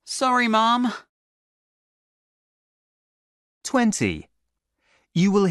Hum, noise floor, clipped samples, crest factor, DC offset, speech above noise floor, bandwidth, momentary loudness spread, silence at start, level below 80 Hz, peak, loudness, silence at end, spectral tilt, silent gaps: none; -77 dBFS; under 0.1%; 18 dB; under 0.1%; 57 dB; 12 kHz; 16 LU; 0.05 s; -58 dBFS; -8 dBFS; -21 LUFS; 0 s; -4.5 dB/octave; 1.09-3.61 s